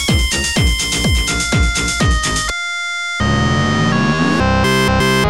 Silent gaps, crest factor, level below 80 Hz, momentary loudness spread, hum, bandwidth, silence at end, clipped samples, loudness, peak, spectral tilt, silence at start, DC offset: none; 10 dB; -22 dBFS; 5 LU; none; 16.5 kHz; 0 s; under 0.1%; -15 LUFS; -4 dBFS; -4 dB/octave; 0 s; under 0.1%